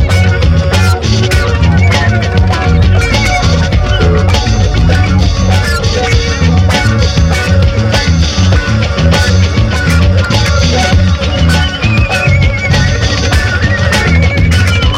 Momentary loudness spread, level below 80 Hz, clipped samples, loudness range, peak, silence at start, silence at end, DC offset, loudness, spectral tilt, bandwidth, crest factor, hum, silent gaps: 2 LU; -14 dBFS; under 0.1%; 0 LU; 0 dBFS; 0 s; 0 s; under 0.1%; -10 LUFS; -5.5 dB/octave; 13 kHz; 8 dB; none; none